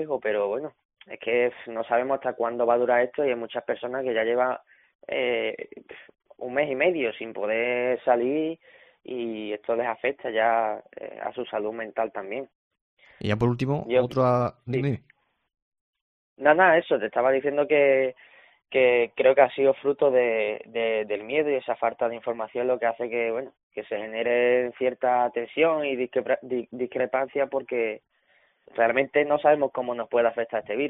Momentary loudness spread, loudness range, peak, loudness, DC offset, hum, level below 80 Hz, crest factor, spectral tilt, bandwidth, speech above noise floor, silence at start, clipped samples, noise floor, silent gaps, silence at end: 12 LU; 6 LU; -4 dBFS; -25 LUFS; under 0.1%; none; -64 dBFS; 22 dB; -4 dB/octave; 5 kHz; 40 dB; 0 s; under 0.1%; -65 dBFS; 0.85-0.89 s, 4.95-4.99 s, 12.55-12.71 s, 12.81-12.97 s, 15.62-15.72 s, 15.81-15.93 s, 16.01-16.36 s, 23.63-23.71 s; 0 s